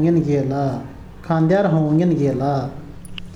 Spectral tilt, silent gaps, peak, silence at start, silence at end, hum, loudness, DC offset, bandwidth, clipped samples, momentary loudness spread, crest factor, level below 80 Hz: -9 dB/octave; none; -6 dBFS; 0 s; 0 s; none; -19 LUFS; under 0.1%; 10.5 kHz; under 0.1%; 19 LU; 12 dB; -44 dBFS